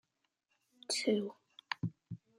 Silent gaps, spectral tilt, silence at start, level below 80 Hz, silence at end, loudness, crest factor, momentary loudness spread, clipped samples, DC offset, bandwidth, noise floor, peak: none; -4 dB/octave; 0.9 s; -80 dBFS; 0.25 s; -37 LUFS; 22 dB; 17 LU; under 0.1%; under 0.1%; 14 kHz; -83 dBFS; -18 dBFS